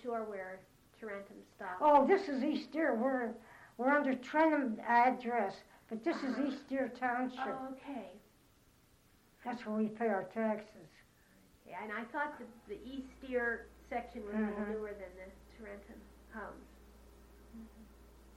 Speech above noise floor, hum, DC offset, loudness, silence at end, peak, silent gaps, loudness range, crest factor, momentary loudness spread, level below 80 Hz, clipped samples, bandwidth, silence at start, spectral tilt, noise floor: 31 dB; none; under 0.1%; -36 LUFS; 0 s; -16 dBFS; none; 11 LU; 22 dB; 23 LU; -66 dBFS; under 0.1%; 15.5 kHz; 0 s; -6 dB/octave; -67 dBFS